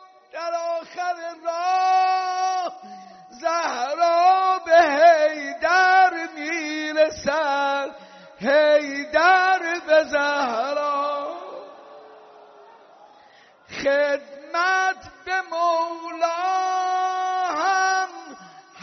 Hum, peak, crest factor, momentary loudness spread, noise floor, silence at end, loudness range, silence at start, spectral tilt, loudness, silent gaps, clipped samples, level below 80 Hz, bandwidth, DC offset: none; -4 dBFS; 18 dB; 13 LU; -52 dBFS; 0 s; 9 LU; 0.35 s; 0.5 dB/octave; -21 LUFS; none; under 0.1%; -64 dBFS; 6.4 kHz; under 0.1%